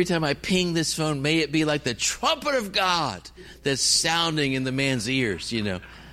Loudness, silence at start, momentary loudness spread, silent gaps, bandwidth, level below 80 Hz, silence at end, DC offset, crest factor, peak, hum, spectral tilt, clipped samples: -23 LUFS; 0 s; 9 LU; none; 16 kHz; -50 dBFS; 0 s; under 0.1%; 16 dB; -8 dBFS; none; -3.5 dB/octave; under 0.1%